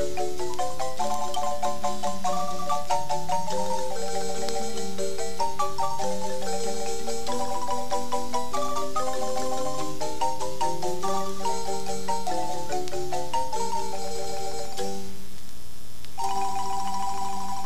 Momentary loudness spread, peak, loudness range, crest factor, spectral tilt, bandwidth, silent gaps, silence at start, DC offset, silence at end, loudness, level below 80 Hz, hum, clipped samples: 4 LU; -10 dBFS; 3 LU; 22 dB; -3.5 dB/octave; 15.5 kHz; none; 0 s; 8%; 0 s; -30 LUFS; -52 dBFS; none; under 0.1%